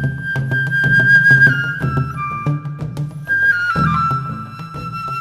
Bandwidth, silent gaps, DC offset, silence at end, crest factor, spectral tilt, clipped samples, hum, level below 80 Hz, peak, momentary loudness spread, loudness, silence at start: 13 kHz; none; under 0.1%; 0 s; 14 dB; -6.5 dB/octave; under 0.1%; none; -42 dBFS; -2 dBFS; 17 LU; -15 LUFS; 0 s